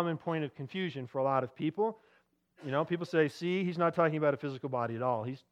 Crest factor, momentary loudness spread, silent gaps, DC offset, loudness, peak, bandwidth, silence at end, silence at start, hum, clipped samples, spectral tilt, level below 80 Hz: 18 dB; 8 LU; none; under 0.1%; -33 LUFS; -14 dBFS; 11.5 kHz; 0.15 s; 0 s; none; under 0.1%; -7.5 dB/octave; -82 dBFS